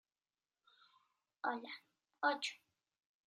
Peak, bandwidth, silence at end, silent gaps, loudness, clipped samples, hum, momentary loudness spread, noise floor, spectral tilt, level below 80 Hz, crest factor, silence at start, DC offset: -22 dBFS; 13 kHz; 0.7 s; none; -41 LUFS; under 0.1%; none; 16 LU; under -90 dBFS; -1 dB/octave; under -90 dBFS; 24 dB; 1.45 s; under 0.1%